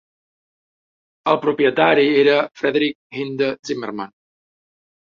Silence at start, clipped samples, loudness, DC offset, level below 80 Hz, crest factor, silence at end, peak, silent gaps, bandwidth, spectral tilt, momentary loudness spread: 1.25 s; under 0.1%; -18 LUFS; under 0.1%; -66 dBFS; 18 dB; 1.05 s; -2 dBFS; 2.95-3.10 s, 3.59-3.63 s; 7.2 kHz; -5.5 dB/octave; 14 LU